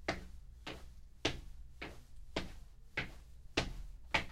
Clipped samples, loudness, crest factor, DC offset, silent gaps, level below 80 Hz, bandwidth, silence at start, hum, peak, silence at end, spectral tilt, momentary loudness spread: under 0.1%; -43 LUFS; 26 dB; under 0.1%; none; -52 dBFS; 15.5 kHz; 0 s; none; -18 dBFS; 0 s; -3.5 dB/octave; 19 LU